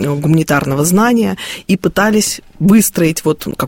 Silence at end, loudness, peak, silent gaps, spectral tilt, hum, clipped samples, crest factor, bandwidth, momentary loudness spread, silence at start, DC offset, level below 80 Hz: 0 s; -13 LUFS; 0 dBFS; none; -5 dB/octave; none; under 0.1%; 12 dB; 17 kHz; 7 LU; 0 s; under 0.1%; -42 dBFS